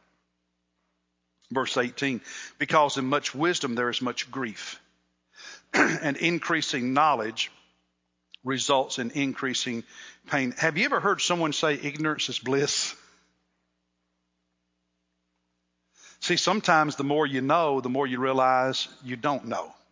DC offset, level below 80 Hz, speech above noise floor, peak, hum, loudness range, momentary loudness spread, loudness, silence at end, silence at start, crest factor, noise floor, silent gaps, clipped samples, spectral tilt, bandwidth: under 0.1%; -76 dBFS; 51 dB; -6 dBFS; 60 Hz at -65 dBFS; 5 LU; 11 LU; -26 LUFS; 0.2 s; 1.5 s; 22 dB; -77 dBFS; none; under 0.1%; -3.5 dB/octave; 7.8 kHz